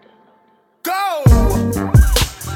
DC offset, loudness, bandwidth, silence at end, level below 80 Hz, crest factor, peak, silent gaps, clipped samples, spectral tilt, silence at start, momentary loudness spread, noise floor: under 0.1%; -15 LUFS; 17.5 kHz; 0 s; -18 dBFS; 14 dB; 0 dBFS; none; under 0.1%; -5.5 dB/octave; 0.85 s; 8 LU; -56 dBFS